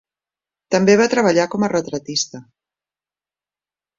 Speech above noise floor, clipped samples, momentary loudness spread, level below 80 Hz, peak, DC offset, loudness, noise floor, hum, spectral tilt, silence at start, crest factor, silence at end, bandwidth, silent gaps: over 73 dB; under 0.1%; 9 LU; -60 dBFS; -2 dBFS; under 0.1%; -17 LUFS; under -90 dBFS; 50 Hz at -45 dBFS; -4.5 dB/octave; 0.7 s; 18 dB; 1.55 s; 7.6 kHz; none